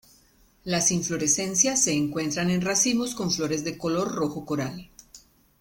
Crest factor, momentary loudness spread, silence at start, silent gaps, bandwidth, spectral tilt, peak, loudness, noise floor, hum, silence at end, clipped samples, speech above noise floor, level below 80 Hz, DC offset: 20 dB; 9 LU; 0.65 s; none; 17 kHz; -3 dB/octave; -8 dBFS; -24 LUFS; -60 dBFS; none; 0.4 s; under 0.1%; 34 dB; -58 dBFS; under 0.1%